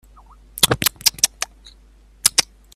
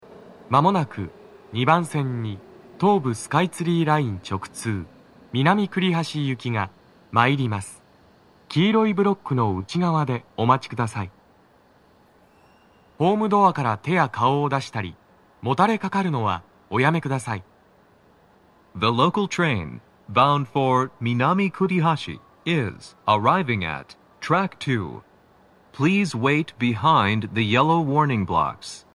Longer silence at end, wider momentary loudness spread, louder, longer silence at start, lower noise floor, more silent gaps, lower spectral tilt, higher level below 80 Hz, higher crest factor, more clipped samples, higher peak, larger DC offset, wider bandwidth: first, 0.3 s vs 0.15 s; about the same, 13 LU vs 13 LU; first, -17 LUFS vs -22 LUFS; first, 0.55 s vs 0.1 s; second, -49 dBFS vs -56 dBFS; neither; second, -0.5 dB/octave vs -6.5 dB/octave; first, -46 dBFS vs -58 dBFS; about the same, 22 dB vs 22 dB; neither; about the same, 0 dBFS vs -2 dBFS; neither; first, 16.5 kHz vs 12 kHz